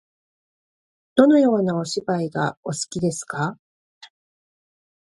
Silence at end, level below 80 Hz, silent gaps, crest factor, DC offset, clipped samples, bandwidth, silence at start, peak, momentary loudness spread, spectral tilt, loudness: 1.5 s; -64 dBFS; 2.57-2.63 s; 22 dB; under 0.1%; under 0.1%; 11.5 kHz; 1.15 s; -2 dBFS; 12 LU; -5.5 dB/octave; -21 LUFS